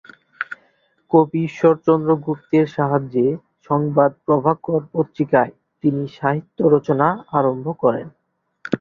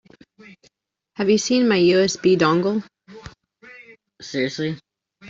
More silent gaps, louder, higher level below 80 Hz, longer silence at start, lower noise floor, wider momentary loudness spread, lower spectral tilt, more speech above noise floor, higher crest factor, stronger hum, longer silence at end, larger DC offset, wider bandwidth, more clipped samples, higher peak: neither; about the same, -19 LUFS vs -19 LUFS; about the same, -60 dBFS vs -60 dBFS; second, 0.4 s vs 1.2 s; second, -61 dBFS vs -65 dBFS; second, 11 LU vs 20 LU; first, -9.5 dB/octave vs -5 dB/octave; second, 43 dB vs 47 dB; about the same, 18 dB vs 18 dB; neither; about the same, 0.05 s vs 0 s; neither; second, 7 kHz vs 7.8 kHz; neither; about the same, -2 dBFS vs -4 dBFS